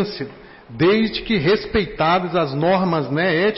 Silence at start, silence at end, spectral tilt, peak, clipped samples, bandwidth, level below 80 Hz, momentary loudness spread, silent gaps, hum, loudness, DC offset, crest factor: 0 s; 0 s; -10 dB/octave; -8 dBFS; under 0.1%; 5.8 kHz; -44 dBFS; 9 LU; none; none; -19 LUFS; under 0.1%; 10 dB